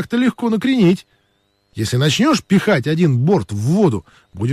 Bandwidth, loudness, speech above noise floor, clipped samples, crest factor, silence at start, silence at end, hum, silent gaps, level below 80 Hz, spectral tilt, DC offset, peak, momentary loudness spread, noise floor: 14.5 kHz; -16 LUFS; 47 dB; under 0.1%; 12 dB; 0 s; 0 s; none; none; -46 dBFS; -6 dB/octave; under 0.1%; -4 dBFS; 9 LU; -63 dBFS